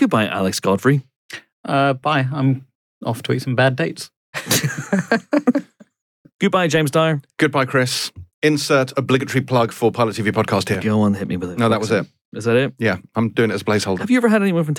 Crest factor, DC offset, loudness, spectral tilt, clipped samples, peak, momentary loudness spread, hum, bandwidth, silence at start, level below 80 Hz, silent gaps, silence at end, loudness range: 14 dB; under 0.1%; -19 LUFS; -5.5 dB/octave; under 0.1%; -4 dBFS; 8 LU; none; 18.5 kHz; 0 s; -60 dBFS; 1.16-1.29 s, 1.52-1.63 s, 2.75-3.01 s, 4.16-4.33 s, 6.02-6.25 s, 6.32-6.39 s, 8.34-8.42 s, 12.21-12.32 s; 0 s; 2 LU